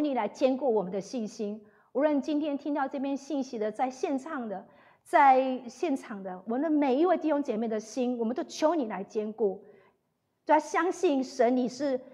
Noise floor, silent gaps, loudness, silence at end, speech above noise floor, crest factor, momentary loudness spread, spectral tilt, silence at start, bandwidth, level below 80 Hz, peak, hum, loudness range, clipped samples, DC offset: -77 dBFS; none; -29 LUFS; 0 s; 49 dB; 20 dB; 11 LU; -5 dB/octave; 0 s; 12 kHz; -84 dBFS; -10 dBFS; none; 4 LU; under 0.1%; under 0.1%